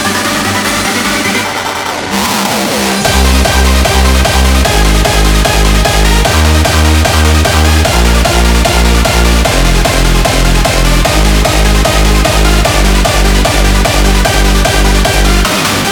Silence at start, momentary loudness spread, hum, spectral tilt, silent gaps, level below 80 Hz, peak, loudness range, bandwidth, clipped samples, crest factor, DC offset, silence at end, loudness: 0 s; 3 LU; none; -4 dB/octave; none; -10 dBFS; 0 dBFS; 2 LU; 20 kHz; 0.1%; 8 dB; 0.3%; 0 s; -9 LUFS